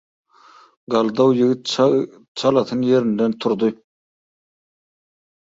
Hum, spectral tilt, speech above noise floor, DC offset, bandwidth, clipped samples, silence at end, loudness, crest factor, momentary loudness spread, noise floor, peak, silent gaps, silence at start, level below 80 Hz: none; -6 dB/octave; 32 dB; under 0.1%; 7.8 kHz; under 0.1%; 1.7 s; -19 LUFS; 18 dB; 6 LU; -50 dBFS; -4 dBFS; 2.28-2.35 s; 0.9 s; -64 dBFS